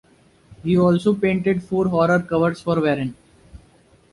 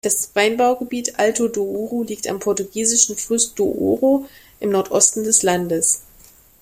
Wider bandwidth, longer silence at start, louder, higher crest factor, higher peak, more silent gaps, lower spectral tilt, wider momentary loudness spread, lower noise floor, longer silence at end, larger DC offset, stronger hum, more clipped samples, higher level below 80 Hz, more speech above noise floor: second, 11.5 kHz vs 16 kHz; first, 0.5 s vs 0.05 s; about the same, -20 LUFS vs -18 LUFS; about the same, 16 dB vs 18 dB; second, -4 dBFS vs 0 dBFS; neither; first, -8 dB/octave vs -2.5 dB/octave; second, 6 LU vs 9 LU; first, -54 dBFS vs -49 dBFS; about the same, 0.55 s vs 0.6 s; neither; neither; neither; first, -50 dBFS vs -56 dBFS; first, 35 dB vs 30 dB